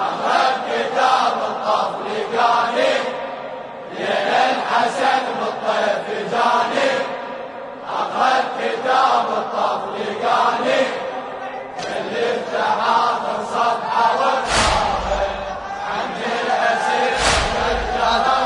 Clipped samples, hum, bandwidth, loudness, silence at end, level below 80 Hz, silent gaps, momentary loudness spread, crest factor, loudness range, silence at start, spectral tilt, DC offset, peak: under 0.1%; none; 11 kHz; -19 LUFS; 0 s; -40 dBFS; none; 10 LU; 16 dB; 2 LU; 0 s; -3 dB/octave; under 0.1%; -4 dBFS